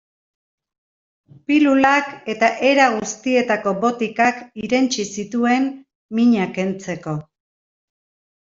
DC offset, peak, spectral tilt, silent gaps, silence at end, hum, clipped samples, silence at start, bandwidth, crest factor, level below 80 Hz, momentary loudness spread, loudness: under 0.1%; -2 dBFS; -4.5 dB/octave; 5.95-6.09 s; 1.3 s; none; under 0.1%; 1.5 s; 7.8 kHz; 18 dB; -62 dBFS; 12 LU; -18 LUFS